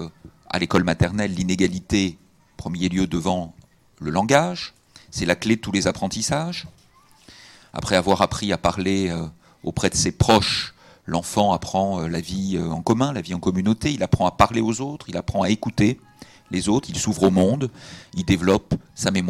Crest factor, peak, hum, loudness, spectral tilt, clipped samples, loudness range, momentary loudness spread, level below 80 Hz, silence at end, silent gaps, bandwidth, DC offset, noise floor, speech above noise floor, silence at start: 22 dB; 0 dBFS; none; -22 LUFS; -5 dB/octave; under 0.1%; 3 LU; 13 LU; -44 dBFS; 0 s; none; 15 kHz; under 0.1%; -53 dBFS; 31 dB; 0 s